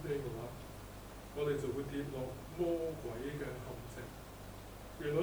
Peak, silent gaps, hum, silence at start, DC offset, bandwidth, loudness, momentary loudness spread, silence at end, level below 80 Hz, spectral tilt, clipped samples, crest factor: -22 dBFS; none; 50 Hz at -55 dBFS; 0 s; under 0.1%; over 20 kHz; -42 LUFS; 14 LU; 0 s; -56 dBFS; -6.5 dB/octave; under 0.1%; 18 dB